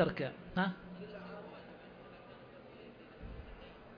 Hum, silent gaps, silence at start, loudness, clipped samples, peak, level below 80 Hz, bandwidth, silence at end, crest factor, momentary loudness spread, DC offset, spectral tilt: none; none; 0 s; -42 LUFS; under 0.1%; -20 dBFS; -60 dBFS; 5.2 kHz; 0 s; 22 dB; 18 LU; under 0.1%; -5 dB/octave